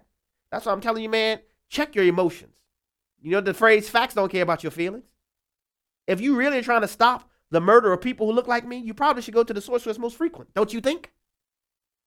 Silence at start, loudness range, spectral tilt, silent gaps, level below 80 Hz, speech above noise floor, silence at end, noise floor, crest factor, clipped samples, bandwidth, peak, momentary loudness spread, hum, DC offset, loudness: 0.5 s; 4 LU; -5 dB/octave; none; -60 dBFS; 66 dB; 1.1 s; -88 dBFS; 22 dB; under 0.1%; 17 kHz; -2 dBFS; 13 LU; none; under 0.1%; -23 LUFS